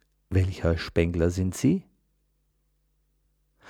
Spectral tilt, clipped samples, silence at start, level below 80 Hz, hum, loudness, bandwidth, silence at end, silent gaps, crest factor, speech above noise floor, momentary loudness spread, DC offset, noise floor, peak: -7 dB/octave; under 0.1%; 0.3 s; -42 dBFS; none; -26 LUFS; 14.5 kHz; 1.9 s; none; 22 dB; 46 dB; 3 LU; under 0.1%; -71 dBFS; -8 dBFS